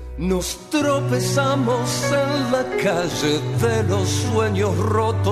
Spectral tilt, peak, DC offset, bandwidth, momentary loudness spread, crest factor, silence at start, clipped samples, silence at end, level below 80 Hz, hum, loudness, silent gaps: -5 dB/octave; -8 dBFS; under 0.1%; 14 kHz; 3 LU; 12 dB; 0 s; under 0.1%; 0 s; -40 dBFS; none; -20 LUFS; none